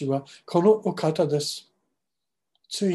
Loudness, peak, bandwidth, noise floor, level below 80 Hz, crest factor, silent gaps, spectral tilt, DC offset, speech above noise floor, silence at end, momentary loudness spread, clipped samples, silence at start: -24 LUFS; -6 dBFS; 12.5 kHz; -86 dBFS; -74 dBFS; 18 dB; none; -6 dB/octave; under 0.1%; 62 dB; 0 s; 12 LU; under 0.1%; 0 s